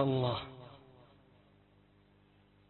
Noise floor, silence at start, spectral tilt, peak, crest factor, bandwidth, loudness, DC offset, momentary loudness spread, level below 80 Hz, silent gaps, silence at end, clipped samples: -66 dBFS; 0 s; -6 dB/octave; -16 dBFS; 22 dB; 4.2 kHz; -36 LUFS; under 0.1%; 28 LU; -66 dBFS; none; 1.9 s; under 0.1%